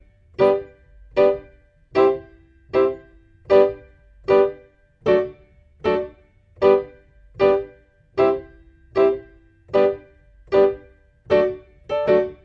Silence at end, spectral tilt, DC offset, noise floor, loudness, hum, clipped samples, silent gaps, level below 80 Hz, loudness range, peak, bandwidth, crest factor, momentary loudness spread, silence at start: 0.1 s; -7.5 dB/octave; under 0.1%; -51 dBFS; -20 LUFS; none; under 0.1%; none; -52 dBFS; 1 LU; -2 dBFS; 5.6 kHz; 18 dB; 15 LU; 0.4 s